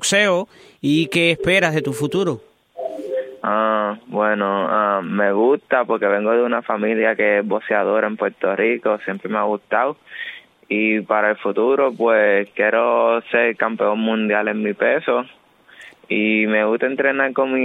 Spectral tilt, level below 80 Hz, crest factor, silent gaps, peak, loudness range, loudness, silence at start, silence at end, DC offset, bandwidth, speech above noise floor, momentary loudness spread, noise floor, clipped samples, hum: -4.5 dB/octave; -60 dBFS; 18 dB; none; -2 dBFS; 3 LU; -18 LUFS; 0 s; 0 s; under 0.1%; 15.5 kHz; 26 dB; 8 LU; -45 dBFS; under 0.1%; none